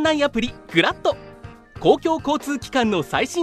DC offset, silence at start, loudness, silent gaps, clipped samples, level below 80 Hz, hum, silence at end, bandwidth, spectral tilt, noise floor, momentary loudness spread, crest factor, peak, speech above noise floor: under 0.1%; 0 s; -21 LUFS; none; under 0.1%; -46 dBFS; none; 0 s; 14.5 kHz; -4.5 dB/octave; -41 dBFS; 8 LU; 20 dB; -2 dBFS; 21 dB